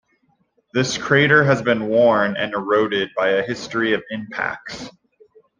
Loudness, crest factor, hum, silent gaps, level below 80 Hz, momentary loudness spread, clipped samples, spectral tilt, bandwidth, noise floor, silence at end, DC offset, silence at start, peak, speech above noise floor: -19 LUFS; 18 dB; none; none; -58 dBFS; 13 LU; under 0.1%; -5 dB/octave; 9.8 kHz; -64 dBFS; 0.7 s; under 0.1%; 0.75 s; -2 dBFS; 45 dB